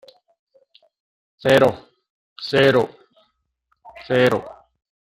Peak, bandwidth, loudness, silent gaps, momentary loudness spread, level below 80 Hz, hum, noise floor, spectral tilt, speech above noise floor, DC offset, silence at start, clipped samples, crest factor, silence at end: -2 dBFS; 16 kHz; -18 LUFS; 2.10-2.36 s; 17 LU; -58 dBFS; none; -70 dBFS; -6 dB/octave; 53 dB; under 0.1%; 1.45 s; under 0.1%; 20 dB; 0.7 s